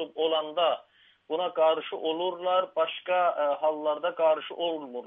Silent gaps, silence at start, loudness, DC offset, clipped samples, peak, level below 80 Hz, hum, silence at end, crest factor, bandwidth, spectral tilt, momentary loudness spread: none; 0 s; -28 LUFS; under 0.1%; under 0.1%; -14 dBFS; -88 dBFS; none; 0 s; 14 dB; 3.9 kHz; -6.5 dB/octave; 6 LU